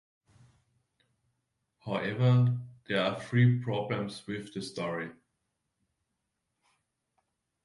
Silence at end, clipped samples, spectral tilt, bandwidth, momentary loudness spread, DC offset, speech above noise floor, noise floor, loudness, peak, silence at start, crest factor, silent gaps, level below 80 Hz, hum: 2.55 s; under 0.1%; -7.5 dB/octave; 11 kHz; 13 LU; under 0.1%; 54 dB; -83 dBFS; -30 LUFS; -14 dBFS; 1.85 s; 20 dB; none; -70 dBFS; none